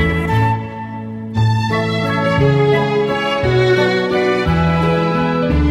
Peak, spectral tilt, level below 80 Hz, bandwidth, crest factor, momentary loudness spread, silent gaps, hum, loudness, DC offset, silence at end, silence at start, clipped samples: -2 dBFS; -7 dB/octave; -30 dBFS; 12 kHz; 14 dB; 8 LU; none; none; -15 LUFS; under 0.1%; 0 s; 0 s; under 0.1%